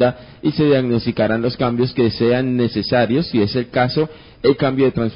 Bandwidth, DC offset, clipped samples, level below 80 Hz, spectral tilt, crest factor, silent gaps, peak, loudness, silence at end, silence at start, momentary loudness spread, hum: 5.4 kHz; 0.1%; under 0.1%; -44 dBFS; -11 dB/octave; 16 dB; none; -2 dBFS; -18 LUFS; 0 s; 0 s; 4 LU; none